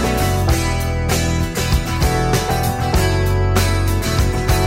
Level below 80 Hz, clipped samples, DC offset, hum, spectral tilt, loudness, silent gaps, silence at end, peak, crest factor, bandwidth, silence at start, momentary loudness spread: -22 dBFS; under 0.1%; under 0.1%; none; -5 dB/octave; -18 LUFS; none; 0 s; -4 dBFS; 12 dB; 16.5 kHz; 0 s; 2 LU